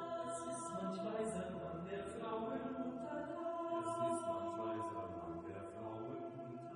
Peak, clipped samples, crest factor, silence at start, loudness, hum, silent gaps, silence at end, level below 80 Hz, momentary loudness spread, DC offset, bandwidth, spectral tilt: -28 dBFS; under 0.1%; 16 dB; 0 s; -44 LUFS; none; none; 0 s; -72 dBFS; 8 LU; under 0.1%; 10 kHz; -6 dB/octave